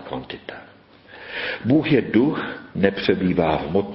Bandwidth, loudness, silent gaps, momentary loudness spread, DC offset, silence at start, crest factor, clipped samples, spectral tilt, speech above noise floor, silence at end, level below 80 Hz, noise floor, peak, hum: 5.8 kHz; -21 LUFS; none; 17 LU; under 0.1%; 0 s; 20 dB; under 0.1%; -11 dB/octave; 23 dB; 0 s; -48 dBFS; -44 dBFS; -2 dBFS; none